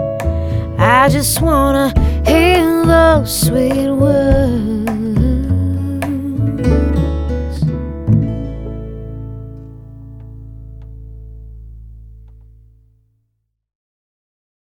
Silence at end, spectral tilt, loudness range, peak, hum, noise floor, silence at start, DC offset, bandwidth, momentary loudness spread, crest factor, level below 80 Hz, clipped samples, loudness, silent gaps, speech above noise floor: 2.5 s; -6 dB/octave; 20 LU; 0 dBFS; none; -68 dBFS; 0 s; under 0.1%; 19 kHz; 25 LU; 16 dB; -24 dBFS; under 0.1%; -14 LUFS; none; 57 dB